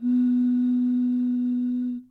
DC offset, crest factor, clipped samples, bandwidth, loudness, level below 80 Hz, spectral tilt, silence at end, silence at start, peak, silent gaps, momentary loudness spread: under 0.1%; 6 dB; under 0.1%; 3.9 kHz; -24 LUFS; -70 dBFS; -8.5 dB/octave; 0.05 s; 0 s; -16 dBFS; none; 5 LU